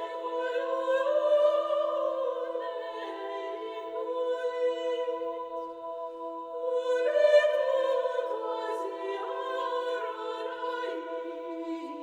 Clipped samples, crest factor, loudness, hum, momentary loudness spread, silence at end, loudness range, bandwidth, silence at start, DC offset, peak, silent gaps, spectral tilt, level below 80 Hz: under 0.1%; 18 dB; -30 LUFS; none; 13 LU; 0 s; 6 LU; 9.2 kHz; 0 s; under 0.1%; -12 dBFS; none; -2 dB/octave; -82 dBFS